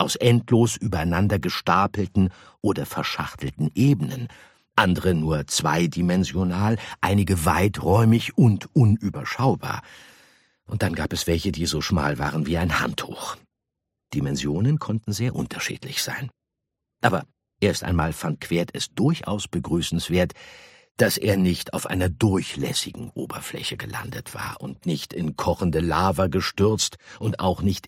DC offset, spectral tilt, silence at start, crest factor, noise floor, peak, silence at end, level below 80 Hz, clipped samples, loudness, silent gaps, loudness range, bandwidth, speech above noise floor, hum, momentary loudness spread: under 0.1%; -5.5 dB/octave; 0 s; 22 dB; -83 dBFS; -2 dBFS; 0 s; -44 dBFS; under 0.1%; -23 LUFS; 20.91-20.95 s; 6 LU; 16.5 kHz; 60 dB; none; 12 LU